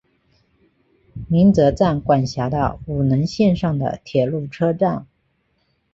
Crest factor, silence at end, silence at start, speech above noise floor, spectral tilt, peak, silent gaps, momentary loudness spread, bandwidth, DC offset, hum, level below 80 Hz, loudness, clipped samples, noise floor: 16 dB; 0.9 s; 1.15 s; 49 dB; -8 dB/octave; -4 dBFS; none; 8 LU; 7.8 kHz; under 0.1%; none; -42 dBFS; -19 LUFS; under 0.1%; -66 dBFS